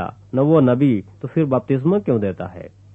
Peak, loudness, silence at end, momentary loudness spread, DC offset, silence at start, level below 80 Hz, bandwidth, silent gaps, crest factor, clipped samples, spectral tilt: -4 dBFS; -18 LUFS; 0.25 s; 14 LU; under 0.1%; 0 s; -54 dBFS; 3.9 kHz; none; 16 dB; under 0.1%; -11 dB/octave